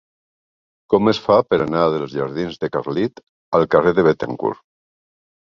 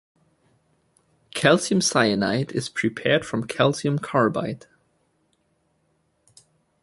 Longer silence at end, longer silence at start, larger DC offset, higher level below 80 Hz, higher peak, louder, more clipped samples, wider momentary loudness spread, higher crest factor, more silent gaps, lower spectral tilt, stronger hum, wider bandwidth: second, 1.05 s vs 2.25 s; second, 0.9 s vs 1.35 s; neither; first, -52 dBFS vs -60 dBFS; about the same, 0 dBFS vs -2 dBFS; first, -18 LUFS vs -22 LUFS; neither; about the same, 9 LU vs 10 LU; about the same, 20 dB vs 22 dB; first, 3.23-3.52 s vs none; first, -7.5 dB/octave vs -4.5 dB/octave; neither; second, 7.2 kHz vs 11.5 kHz